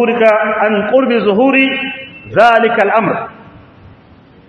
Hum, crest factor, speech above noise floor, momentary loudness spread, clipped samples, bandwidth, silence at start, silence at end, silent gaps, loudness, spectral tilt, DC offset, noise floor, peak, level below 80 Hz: none; 12 dB; 31 dB; 12 LU; 0.2%; 8.6 kHz; 0 s; 1.05 s; none; -11 LUFS; -6.5 dB/octave; under 0.1%; -42 dBFS; 0 dBFS; -54 dBFS